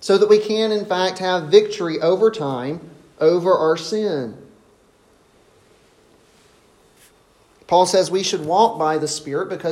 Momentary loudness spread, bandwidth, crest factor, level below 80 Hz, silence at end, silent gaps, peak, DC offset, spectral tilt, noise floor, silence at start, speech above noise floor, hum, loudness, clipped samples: 10 LU; 13 kHz; 18 dB; -64 dBFS; 0 s; none; 0 dBFS; under 0.1%; -4.5 dB/octave; -55 dBFS; 0 s; 37 dB; none; -18 LUFS; under 0.1%